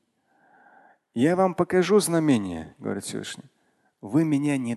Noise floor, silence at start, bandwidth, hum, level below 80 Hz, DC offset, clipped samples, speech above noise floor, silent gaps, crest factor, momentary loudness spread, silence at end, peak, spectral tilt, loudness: -65 dBFS; 1.15 s; 12.5 kHz; none; -60 dBFS; under 0.1%; under 0.1%; 42 dB; none; 18 dB; 16 LU; 0 s; -6 dBFS; -5.5 dB/octave; -24 LUFS